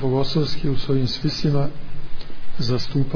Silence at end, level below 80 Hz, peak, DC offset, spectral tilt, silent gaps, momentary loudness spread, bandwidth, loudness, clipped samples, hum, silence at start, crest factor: 0 s; -32 dBFS; -8 dBFS; under 0.1%; -7 dB/octave; none; 18 LU; 5.4 kHz; -23 LUFS; under 0.1%; none; 0 s; 10 dB